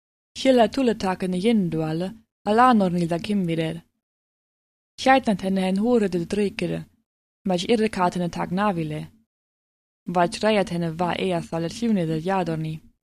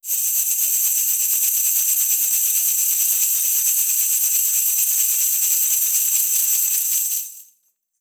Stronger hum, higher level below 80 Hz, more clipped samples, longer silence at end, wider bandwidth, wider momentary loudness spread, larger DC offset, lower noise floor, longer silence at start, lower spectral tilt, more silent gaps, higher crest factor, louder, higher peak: neither; first, -54 dBFS vs under -90 dBFS; neither; second, 0.25 s vs 0.55 s; second, 14 kHz vs over 20 kHz; first, 12 LU vs 2 LU; neither; first, under -90 dBFS vs -65 dBFS; first, 0.35 s vs 0.05 s; first, -6 dB/octave vs 7 dB/octave; first, 2.31-2.45 s, 4.03-4.98 s, 7.06-7.45 s, 9.26-10.06 s vs none; about the same, 18 dB vs 16 dB; second, -23 LUFS vs -16 LUFS; about the same, -4 dBFS vs -4 dBFS